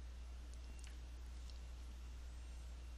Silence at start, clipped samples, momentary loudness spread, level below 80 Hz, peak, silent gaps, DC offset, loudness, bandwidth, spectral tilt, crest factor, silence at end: 0 s; under 0.1%; 1 LU; -52 dBFS; -36 dBFS; none; under 0.1%; -55 LUFS; 12 kHz; -4.5 dB/octave; 14 dB; 0 s